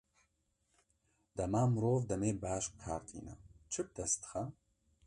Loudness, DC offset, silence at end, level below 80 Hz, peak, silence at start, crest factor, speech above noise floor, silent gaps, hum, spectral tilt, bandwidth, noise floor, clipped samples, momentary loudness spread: -37 LUFS; under 0.1%; 0.55 s; -60 dBFS; -22 dBFS; 1.35 s; 18 dB; 43 dB; none; none; -6 dB/octave; 11 kHz; -80 dBFS; under 0.1%; 16 LU